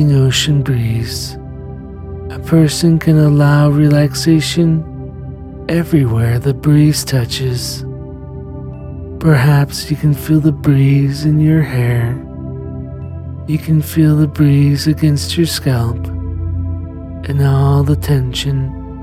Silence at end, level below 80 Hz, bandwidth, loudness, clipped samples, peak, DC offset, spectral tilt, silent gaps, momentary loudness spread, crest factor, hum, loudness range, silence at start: 0 s; -34 dBFS; 15.5 kHz; -13 LUFS; under 0.1%; 0 dBFS; under 0.1%; -6.5 dB/octave; none; 17 LU; 14 dB; none; 4 LU; 0 s